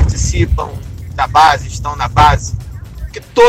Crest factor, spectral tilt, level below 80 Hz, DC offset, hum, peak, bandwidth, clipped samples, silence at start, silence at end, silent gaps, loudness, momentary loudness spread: 12 dB; -4.5 dB/octave; -22 dBFS; under 0.1%; none; 0 dBFS; 15.5 kHz; under 0.1%; 0 s; 0 s; none; -13 LUFS; 19 LU